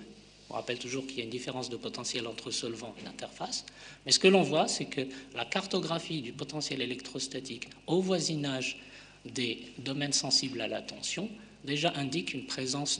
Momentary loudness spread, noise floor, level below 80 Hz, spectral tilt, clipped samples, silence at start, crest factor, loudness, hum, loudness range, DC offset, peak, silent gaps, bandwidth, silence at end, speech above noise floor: 15 LU; -53 dBFS; -68 dBFS; -3 dB/octave; under 0.1%; 0 s; 24 dB; -32 LUFS; none; 7 LU; under 0.1%; -10 dBFS; none; 10 kHz; 0 s; 20 dB